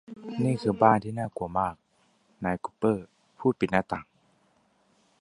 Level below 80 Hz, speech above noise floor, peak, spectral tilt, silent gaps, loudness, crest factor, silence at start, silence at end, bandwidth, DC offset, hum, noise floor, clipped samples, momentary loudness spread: -58 dBFS; 40 dB; -4 dBFS; -7.5 dB/octave; none; -28 LUFS; 24 dB; 0.1 s; 1.2 s; 11.5 kHz; under 0.1%; none; -67 dBFS; under 0.1%; 12 LU